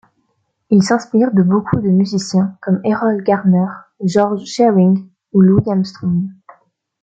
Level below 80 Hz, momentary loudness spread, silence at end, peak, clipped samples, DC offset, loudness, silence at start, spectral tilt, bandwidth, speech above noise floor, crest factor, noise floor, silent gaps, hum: -50 dBFS; 7 LU; 0.7 s; -2 dBFS; under 0.1%; under 0.1%; -15 LUFS; 0.7 s; -7.5 dB/octave; 8 kHz; 53 dB; 12 dB; -67 dBFS; none; none